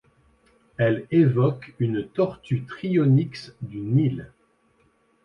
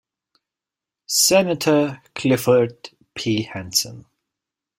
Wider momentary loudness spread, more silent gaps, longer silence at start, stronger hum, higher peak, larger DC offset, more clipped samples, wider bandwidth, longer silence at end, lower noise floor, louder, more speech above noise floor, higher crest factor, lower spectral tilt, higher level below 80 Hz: first, 15 LU vs 11 LU; neither; second, 0.8 s vs 1.1 s; neither; second, -8 dBFS vs -2 dBFS; neither; neither; second, 6.4 kHz vs 16 kHz; first, 1 s vs 0.8 s; second, -64 dBFS vs -88 dBFS; second, -23 LUFS vs -19 LUFS; second, 41 dB vs 68 dB; about the same, 16 dB vs 20 dB; first, -9.5 dB/octave vs -3.5 dB/octave; about the same, -58 dBFS vs -60 dBFS